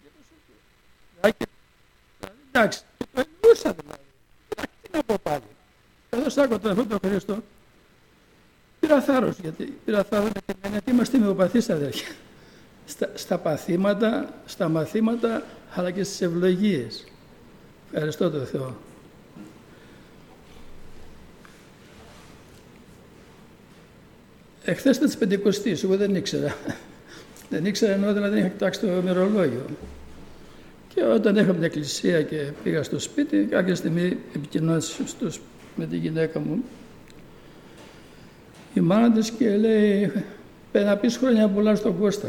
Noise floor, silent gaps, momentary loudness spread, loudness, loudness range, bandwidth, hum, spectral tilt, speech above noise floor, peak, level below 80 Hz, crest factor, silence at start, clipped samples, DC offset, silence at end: -59 dBFS; none; 15 LU; -24 LUFS; 7 LU; 17 kHz; none; -6 dB/octave; 36 dB; -6 dBFS; -54 dBFS; 20 dB; 1.25 s; under 0.1%; under 0.1%; 0 s